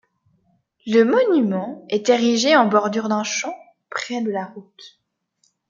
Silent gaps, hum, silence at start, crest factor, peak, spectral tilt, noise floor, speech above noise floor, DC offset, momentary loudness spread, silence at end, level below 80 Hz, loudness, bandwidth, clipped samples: none; none; 0.85 s; 18 dB; -2 dBFS; -4 dB/octave; -67 dBFS; 48 dB; under 0.1%; 15 LU; 0.85 s; -72 dBFS; -19 LUFS; 7.6 kHz; under 0.1%